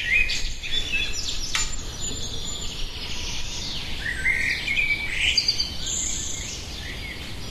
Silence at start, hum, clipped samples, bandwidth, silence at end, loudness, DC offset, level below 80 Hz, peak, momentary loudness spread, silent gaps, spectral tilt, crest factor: 0 s; none; under 0.1%; 13.5 kHz; 0 s; -25 LUFS; under 0.1%; -36 dBFS; -8 dBFS; 11 LU; none; -1 dB/octave; 18 dB